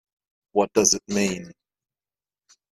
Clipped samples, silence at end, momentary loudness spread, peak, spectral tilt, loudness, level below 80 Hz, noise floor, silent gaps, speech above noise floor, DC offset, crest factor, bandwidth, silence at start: under 0.1%; 1.2 s; 8 LU; -4 dBFS; -3 dB/octave; -22 LUFS; -60 dBFS; under -90 dBFS; none; over 68 dB; under 0.1%; 24 dB; 14 kHz; 0.55 s